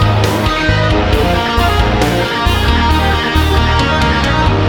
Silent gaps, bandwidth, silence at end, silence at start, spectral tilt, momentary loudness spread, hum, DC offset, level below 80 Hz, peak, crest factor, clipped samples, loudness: none; 19 kHz; 0 s; 0 s; -5.5 dB/octave; 1 LU; none; under 0.1%; -18 dBFS; 0 dBFS; 12 dB; under 0.1%; -12 LUFS